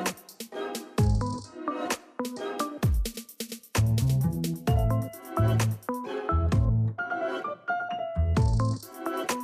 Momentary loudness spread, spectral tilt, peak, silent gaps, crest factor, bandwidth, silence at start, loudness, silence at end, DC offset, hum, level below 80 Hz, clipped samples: 10 LU; -6 dB/octave; -14 dBFS; none; 12 dB; 15.5 kHz; 0 s; -29 LUFS; 0 s; under 0.1%; none; -36 dBFS; under 0.1%